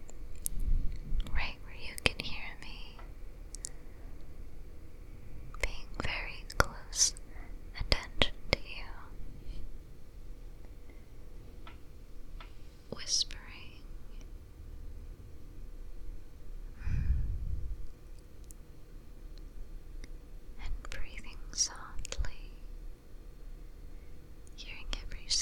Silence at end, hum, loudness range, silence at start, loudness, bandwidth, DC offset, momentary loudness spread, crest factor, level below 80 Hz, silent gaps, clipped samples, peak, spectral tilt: 0 s; none; 17 LU; 0 s; -36 LUFS; 16.5 kHz; under 0.1%; 22 LU; 34 dB; -40 dBFS; none; under 0.1%; -2 dBFS; -2 dB/octave